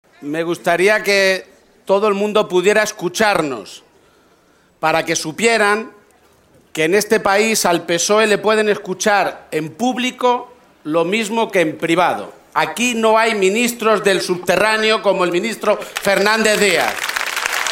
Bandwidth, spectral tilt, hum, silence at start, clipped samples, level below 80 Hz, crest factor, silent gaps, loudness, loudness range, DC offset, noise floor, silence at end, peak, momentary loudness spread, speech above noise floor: 16.5 kHz; -3 dB/octave; none; 0.2 s; under 0.1%; -58 dBFS; 16 dB; none; -16 LUFS; 3 LU; under 0.1%; -54 dBFS; 0 s; 0 dBFS; 8 LU; 38 dB